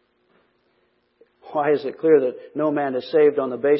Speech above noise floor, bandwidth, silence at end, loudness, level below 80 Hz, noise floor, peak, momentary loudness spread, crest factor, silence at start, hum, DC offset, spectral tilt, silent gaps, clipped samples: 46 dB; 5.8 kHz; 0 s; -21 LUFS; -76 dBFS; -66 dBFS; -4 dBFS; 7 LU; 18 dB; 1.45 s; none; under 0.1%; -10.5 dB/octave; none; under 0.1%